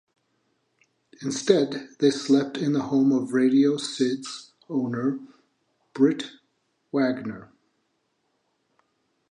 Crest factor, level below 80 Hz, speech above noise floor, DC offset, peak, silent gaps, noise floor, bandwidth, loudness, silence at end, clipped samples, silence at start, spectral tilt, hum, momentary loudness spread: 22 dB; -72 dBFS; 50 dB; under 0.1%; -4 dBFS; none; -73 dBFS; 10.5 kHz; -24 LUFS; 1.9 s; under 0.1%; 1.2 s; -5.5 dB/octave; none; 16 LU